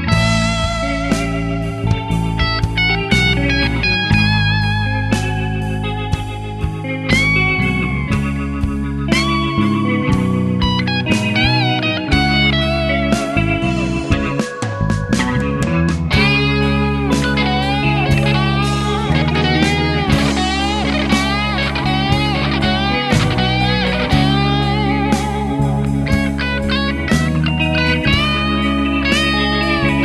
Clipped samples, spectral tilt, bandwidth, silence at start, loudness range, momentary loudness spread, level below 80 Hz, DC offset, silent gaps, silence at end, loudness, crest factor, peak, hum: under 0.1%; -5.5 dB/octave; 13 kHz; 0 s; 2 LU; 6 LU; -26 dBFS; under 0.1%; none; 0 s; -16 LUFS; 16 dB; 0 dBFS; none